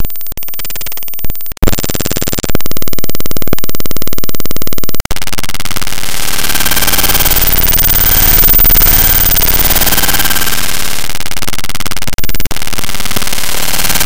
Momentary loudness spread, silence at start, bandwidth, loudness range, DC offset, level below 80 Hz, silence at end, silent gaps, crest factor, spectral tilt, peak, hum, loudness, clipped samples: 14 LU; 0 s; 17.5 kHz; 11 LU; 40%; -18 dBFS; 0 s; none; 12 dB; -2 dB/octave; 0 dBFS; none; -11 LUFS; 0.1%